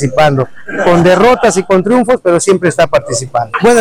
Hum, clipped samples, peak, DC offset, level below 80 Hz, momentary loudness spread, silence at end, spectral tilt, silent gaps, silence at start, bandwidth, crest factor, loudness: none; under 0.1%; -2 dBFS; under 0.1%; -40 dBFS; 8 LU; 0 s; -5 dB/octave; none; 0 s; 16 kHz; 8 dB; -10 LUFS